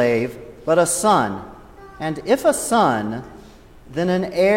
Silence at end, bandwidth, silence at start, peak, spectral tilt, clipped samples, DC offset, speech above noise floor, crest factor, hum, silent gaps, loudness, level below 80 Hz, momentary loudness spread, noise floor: 0 s; 16.5 kHz; 0 s; -4 dBFS; -4.5 dB/octave; under 0.1%; under 0.1%; 25 dB; 16 dB; none; none; -19 LUFS; -48 dBFS; 15 LU; -44 dBFS